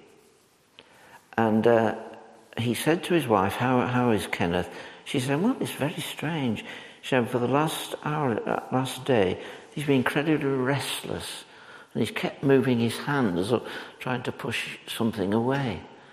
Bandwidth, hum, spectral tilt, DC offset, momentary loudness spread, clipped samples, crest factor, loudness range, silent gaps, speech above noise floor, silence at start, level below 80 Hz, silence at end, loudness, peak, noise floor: 15.5 kHz; none; -5.5 dB/octave; under 0.1%; 14 LU; under 0.1%; 20 dB; 3 LU; none; 35 dB; 1.15 s; -64 dBFS; 0.15 s; -26 LUFS; -6 dBFS; -61 dBFS